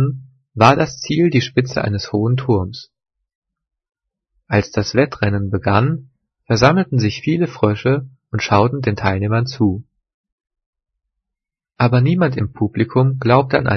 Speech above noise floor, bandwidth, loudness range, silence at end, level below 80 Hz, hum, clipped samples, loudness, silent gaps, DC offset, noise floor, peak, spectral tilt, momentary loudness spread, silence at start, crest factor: 68 dB; 6.6 kHz; 5 LU; 0 s; -48 dBFS; none; under 0.1%; -17 LUFS; 3.35-3.42 s, 10.14-10.24 s, 10.32-10.38 s, 10.66-10.73 s; under 0.1%; -84 dBFS; 0 dBFS; -7 dB/octave; 8 LU; 0 s; 18 dB